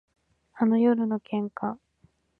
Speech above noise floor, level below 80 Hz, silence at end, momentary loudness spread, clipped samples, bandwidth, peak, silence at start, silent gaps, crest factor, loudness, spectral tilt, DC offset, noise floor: 40 dB; -72 dBFS; 0.65 s; 12 LU; under 0.1%; 4.2 kHz; -10 dBFS; 0.55 s; none; 16 dB; -26 LUFS; -10.5 dB/octave; under 0.1%; -65 dBFS